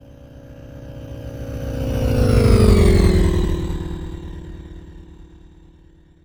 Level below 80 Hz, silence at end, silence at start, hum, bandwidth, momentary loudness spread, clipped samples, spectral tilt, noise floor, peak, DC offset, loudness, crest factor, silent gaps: -24 dBFS; 1 s; 0.25 s; none; over 20 kHz; 24 LU; under 0.1%; -7 dB/octave; -49 dBFS; -2 dBFS; under 0.1%; -18 LUFS; 18 dB; none